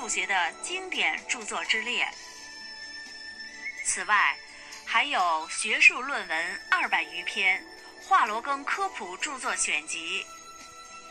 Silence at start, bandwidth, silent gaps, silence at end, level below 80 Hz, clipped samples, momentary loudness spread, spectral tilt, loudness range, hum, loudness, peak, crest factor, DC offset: 0 s; 13 kHz; none; 0 s; -66 dBFS; under 0.1%; 17 LU; 1 dB/octave; 5 LU; none; -26 LUFS; -4 dBFS; 24 dB; under 0.1%